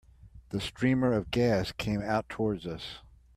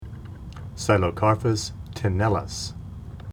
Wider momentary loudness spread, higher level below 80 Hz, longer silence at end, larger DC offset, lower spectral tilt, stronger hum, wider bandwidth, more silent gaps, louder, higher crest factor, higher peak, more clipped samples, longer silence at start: second, 12 LU vs 18 LU; second, -52 dBFS vs -42 dBFS; first, 0.4 s vs 0 s; neither; about the same, -6.5 dB/octave vs -5.5 dB/octave; neither; about the same, 14 kHz vs 14.5 kHz; neither; second, -30 LUFS vs -24 LUFS; about the same, 18 dB vs 20 dB; second, -14 dBFS vs -4 dBFS; neither; first, 0.25 s vs 0 s